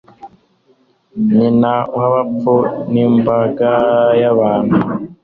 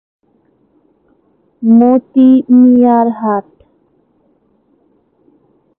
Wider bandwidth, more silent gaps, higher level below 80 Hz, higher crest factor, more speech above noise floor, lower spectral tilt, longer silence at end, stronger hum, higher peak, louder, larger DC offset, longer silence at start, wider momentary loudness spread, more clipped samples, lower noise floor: first, 4.5 kHz vs 3.5 kHz; neither; first, -50 dBFS vs -62 dBFS; about the same, 12 dB vs 12 dB; second, 42 dB vs 47 dB; about the same, -10.5 dB/octave vs -11.5 dB/octave; second, 0.1 s vs 2.4 s; neither; about the same, -2 dBFS vs 0 dBFS; second, -14 LUFS vs -9 LUFS; neither; second, 0.25 s vs 1.6 s; second, 4 LU vs 10 LU; neither; about the same, -55 dBFS vs -56 dBFS